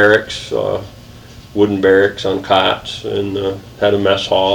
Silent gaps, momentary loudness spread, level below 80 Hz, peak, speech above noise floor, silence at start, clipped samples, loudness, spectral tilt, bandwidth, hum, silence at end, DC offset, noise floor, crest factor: none; 10 LU; -44 dBFS; 0 dBFS; 22 dB; 0 s; under 0.1%; -16 LUFS; -5 dB/octave; 19 kHz; none; 0 s; under 0.1%; -37 dBFS; 16 dB